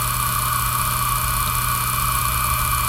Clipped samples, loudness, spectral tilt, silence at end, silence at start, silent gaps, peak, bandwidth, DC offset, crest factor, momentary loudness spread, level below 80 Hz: under 0.1%; -19 LUFS; -2 dB/octave; 0 s; 0 s; none; -6 dBFS; 17 kHz; under 0.1%; 14 dB; 0 LU; -30 dBFS